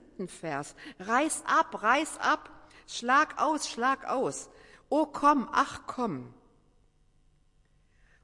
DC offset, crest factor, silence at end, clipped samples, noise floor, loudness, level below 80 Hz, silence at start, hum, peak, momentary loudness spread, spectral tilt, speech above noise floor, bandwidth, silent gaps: under 0.1%; 20 dB; 1.9 s; under 0.1%; -65 dBFS; -28 LUFS; -64 dBFS; 0.2 s; none; -10 dBFS; 15 LU; -3 dB/octave; 36 dB; 11.5 kHz; none